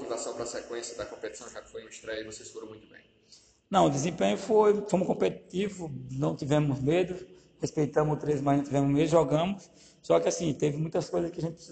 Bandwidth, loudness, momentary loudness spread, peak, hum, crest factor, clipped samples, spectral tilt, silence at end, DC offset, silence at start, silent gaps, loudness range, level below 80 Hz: 9.2 kHz; -29 LUFS; 17 LU; -10 dBFS; none; 20 dB; under 0.1%; -6 dB/octave; 0 s; under 0.1%; 0 s; none; 7 LU; -60 dBFS